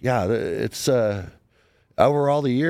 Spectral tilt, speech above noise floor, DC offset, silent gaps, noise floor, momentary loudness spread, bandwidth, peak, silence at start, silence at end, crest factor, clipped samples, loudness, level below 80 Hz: -6 dB/octave; 40 dB; under 0.1%; none; -61 dBFS; 14 LU; 16.5 kHz; -2 dBFS; 0 s; 0 s; 20 dB; under 0.1%; -22 LUFS; -52 dBFS